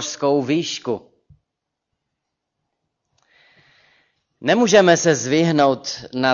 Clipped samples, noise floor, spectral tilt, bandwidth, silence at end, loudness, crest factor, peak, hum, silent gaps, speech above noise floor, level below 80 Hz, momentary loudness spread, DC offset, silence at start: under 0.1%; -80 dBFS; -4 dB/octave; 7.6 kHz; 0 s; -18 LUFS; 18 dB; -2 dBFS; none; none; 63 dB; -62 dBFS; 14 LU; under 0.1%; 0 s